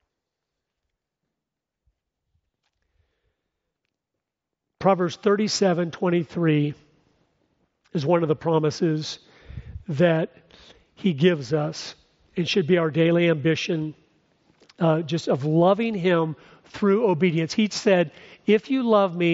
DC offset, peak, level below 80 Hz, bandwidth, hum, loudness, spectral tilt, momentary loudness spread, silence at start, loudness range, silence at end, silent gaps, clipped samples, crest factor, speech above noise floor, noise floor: under 0.1%; -4 dBFS; -58 dBFS; 8 kHz; none; -22 LUFS; -5.5 dB/octave; 13 LU; 4.8 s; 4 LU; 0 s; none; under 0.1%; 20 dB; 63 dB; -85 dBFS